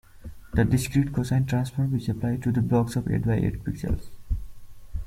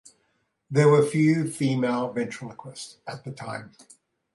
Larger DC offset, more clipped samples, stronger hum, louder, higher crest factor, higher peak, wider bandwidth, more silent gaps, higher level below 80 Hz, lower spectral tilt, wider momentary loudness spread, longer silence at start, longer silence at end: neither; neither; neither; second, -26 LUFS vs -23 LUFS; about the same, 18 dB vs 18 dB; about the same, -8 dBFS vs -8 dBFS; first, 15.5 kHz vs 11.5 kHz; neither; first, -38 dBFS vs -68 dBFS; about the same, -7.5 dB/octave vs -6.5 dB/octave; second, 11 LU vs 19 LU; second, 0.15 s vs 0.7 s; second, 0 s vs 0.65 s